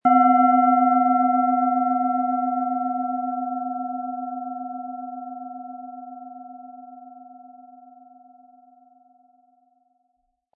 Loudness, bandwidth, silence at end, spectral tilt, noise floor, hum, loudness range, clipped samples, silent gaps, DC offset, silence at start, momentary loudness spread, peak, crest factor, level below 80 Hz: -22 LUFS; 3.1 kHz; 2.9 s; -10 dB/octave; -72 dBFS; none; 23 LU; under 0.1%; none; under 0.1%; 0.05 s; 24 LU; -6 dBFS; 18 dB; -84 dBFS